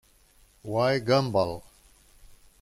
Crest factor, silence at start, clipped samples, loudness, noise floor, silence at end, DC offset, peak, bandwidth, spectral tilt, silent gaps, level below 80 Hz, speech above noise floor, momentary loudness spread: 20 dB; 0.65 s; under 0.1%; -26 LUFS; -60 dBFS; 1 s; under 0.1%; -10 dBFS; 15.5 kHz; -6 dB/octave; none; -56 dBFS; 35 dB; 17 LU